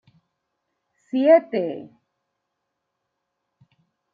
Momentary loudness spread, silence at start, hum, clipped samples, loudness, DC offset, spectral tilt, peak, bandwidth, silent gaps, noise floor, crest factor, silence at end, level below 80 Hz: 15 LU; 1.15 s; none; under 0.1%; -20 LUFS; under 0.1%; -8 dB/octave; -4 dBFS; 5 kHz; none; -79 dBFS; 22 dB; 2.3 s; -82 dBFS